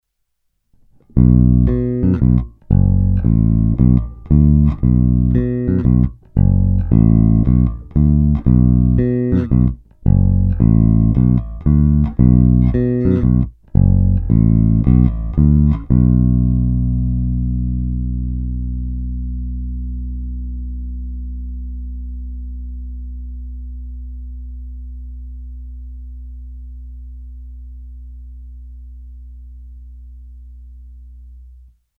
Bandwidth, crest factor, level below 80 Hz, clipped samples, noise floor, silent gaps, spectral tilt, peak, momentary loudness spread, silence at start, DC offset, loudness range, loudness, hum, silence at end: 2.7 kHz; 16 dB; -22 dBFS; under 0.1%; -69 dBFS; none; -13.5 dB/octave; 0 dBFS; 21 LU; 1.15 s; under 0.1%; 20 LU; -15 LUFS; none; 0.5 s